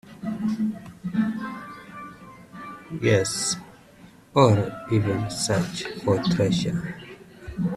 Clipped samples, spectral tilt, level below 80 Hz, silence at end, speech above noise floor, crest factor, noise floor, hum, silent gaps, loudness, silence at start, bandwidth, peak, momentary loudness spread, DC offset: under 0.1%; -5.5 dB/octave; -54 dBFS; 0 s; 27 dB; 22 dB; -50 dBFS; none; none; -24 LUFS; 0.05 s; 13.5 kHz; -2 dBFS; 20 LU; under 0.1%